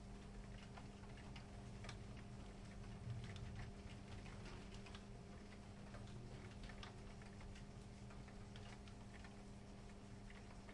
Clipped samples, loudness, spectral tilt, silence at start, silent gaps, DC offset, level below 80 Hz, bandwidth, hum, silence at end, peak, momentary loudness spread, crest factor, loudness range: under 0.1%; -57 LUFS; -5.5 dB/octave; 0 s; none; under 0.1%; -60 dBFS; 11 kHz; none; 0 s; -36 dBFS; 5 LU; 18 dB; 3 LU